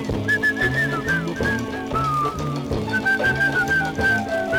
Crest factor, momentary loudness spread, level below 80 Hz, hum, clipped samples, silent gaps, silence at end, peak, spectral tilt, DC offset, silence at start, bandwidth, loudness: 12 dB; 7 LU; -40 dBFS; none; under 0.1%; none; 0 s; -8 dBFS; -5.5 dB/octave; under 0.1%; 0 s; 18.5 kHz; -21 LUFS